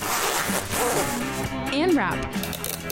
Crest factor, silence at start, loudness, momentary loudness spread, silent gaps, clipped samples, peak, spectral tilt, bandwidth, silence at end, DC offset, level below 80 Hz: 14 dB; 0 s; -24 LUFS; 7 LU; none; under 0.1%; -12 dBFS; -3.5 dB/octave; 17 kHz; 0 s; under 0.1%; -44 dBFS